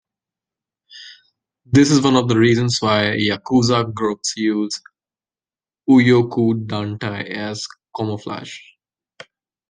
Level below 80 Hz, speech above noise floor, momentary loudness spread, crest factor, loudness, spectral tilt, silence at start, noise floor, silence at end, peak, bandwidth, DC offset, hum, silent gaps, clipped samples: -54 dBFS; over 73 dB; 16 LU; 18 dB; -17 LUFS; -5.5 dB/octave; 0.95 s; under -90 dBFS; 1.1 s; -2 dBFS; 10 kHz; under 0.1%; none; none; under 0.1%